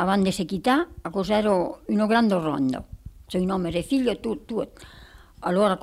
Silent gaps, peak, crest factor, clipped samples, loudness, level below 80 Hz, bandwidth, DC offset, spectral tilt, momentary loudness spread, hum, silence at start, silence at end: none; -8 dBFS; 16 dB; under 0.1%; -24 LUFS; -48 dBFS; 14 kHz; under 0.1%; -6 dB/octave; 10 LU; none; 0 s; 0 s